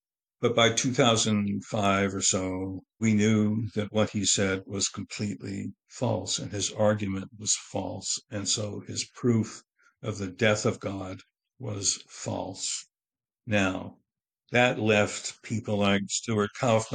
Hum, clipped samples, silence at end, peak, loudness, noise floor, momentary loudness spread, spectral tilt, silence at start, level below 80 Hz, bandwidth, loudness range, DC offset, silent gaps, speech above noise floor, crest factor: none; under 0.1%; 0 s; -6 dBFS; -27 LUFS; under -90 dBFS; 13 LU; -4 dB/octave; 0.4 s; -64 dBFS; 9.8 kHz; 5 LU; under 0.1%; none; over 62 dB; 22 dB